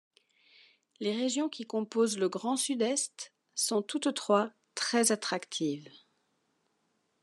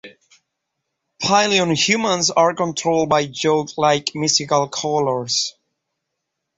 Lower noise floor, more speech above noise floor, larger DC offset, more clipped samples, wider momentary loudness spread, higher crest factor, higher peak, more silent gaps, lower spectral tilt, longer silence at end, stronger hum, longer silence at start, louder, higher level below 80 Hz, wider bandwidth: about the same, -77 dBFS vs -78 dBFS; second, 46 dB vs 60 dB; neither; neither; first, 9 LU vs 5 LU; about the same, 22 dB vs 18 dB; second, -12 dBFS vs -2 dBFS; neither; about the same, -3 dB/octave vs -3 dB/octave; first, 1.35 s vs 1.1 s; neither; first, 1 s vs 0.05 s; second, -31 LUFS vs -18 LUFS; second, under -90 dBFS vs -60 dBFS; first, 12.5 kHz vs 8.2 kHz